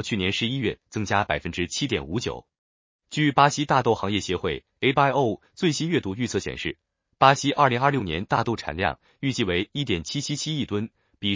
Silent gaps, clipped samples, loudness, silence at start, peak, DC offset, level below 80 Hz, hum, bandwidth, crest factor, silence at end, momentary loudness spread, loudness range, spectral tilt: 2.58-2.99 s; under 0.1%; -24 LUFS; 0 s; -2 dBFS; under 0.1%; -48 dBFS; none; 7.6 kHz; 22 dB; 0 s; 11 LU; 4 LU; -4.5 dB/octave